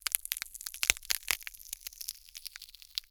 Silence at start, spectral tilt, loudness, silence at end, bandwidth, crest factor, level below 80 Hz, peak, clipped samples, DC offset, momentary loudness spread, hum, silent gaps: 0.05 s; 2 dB/octave; -34 LUFS; 0.1 s; over 20 kHz; 38 dB; -60 dBFS; 0 dBFS; under 0.1%; under 0.1%; 15 LU; none; none